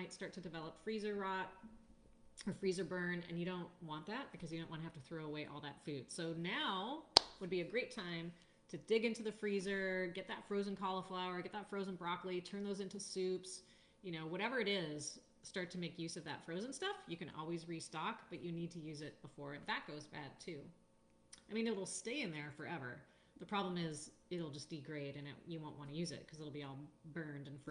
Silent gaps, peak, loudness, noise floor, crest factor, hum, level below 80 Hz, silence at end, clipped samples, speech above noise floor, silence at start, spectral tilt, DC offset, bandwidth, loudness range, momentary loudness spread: none; -4 dBFS; -44 LUFS; -71 dBFS; 40 dB; none; -76 dBFS; 0 s; under 0.1%; 26 dB; 0 s; -4 dB/octave; under 0.1%; 10 kHz; 8 LU; 12 LU